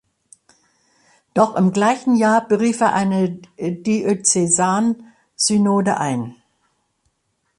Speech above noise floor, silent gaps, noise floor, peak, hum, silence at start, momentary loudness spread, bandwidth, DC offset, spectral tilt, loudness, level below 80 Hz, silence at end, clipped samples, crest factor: 52 dB; none; -70 dBFS; -2 dBFS; none; 1.35 s; 9 LU; 11.5 kHz; under 0.1%; -4.5 dB/octave; -18 LUFS; -62 dBFS; 1.25 s; under 0.1%; 18 dB